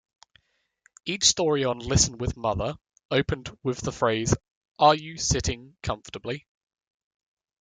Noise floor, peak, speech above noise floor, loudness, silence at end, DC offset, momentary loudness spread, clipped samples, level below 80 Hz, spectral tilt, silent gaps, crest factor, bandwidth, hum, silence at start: -71 dBFS; -4 dBFS; 46 dB; -25 LUFS; 1.25 s; under 0.1%; 13 LU; under 0.1%; -44 dBFS; -3.5 dB/octave; 3.05-3.09 s, 4.51-4.61 s, 4.68-4.75 s; 24 dB; 10.5 kHz; none; 1.05 s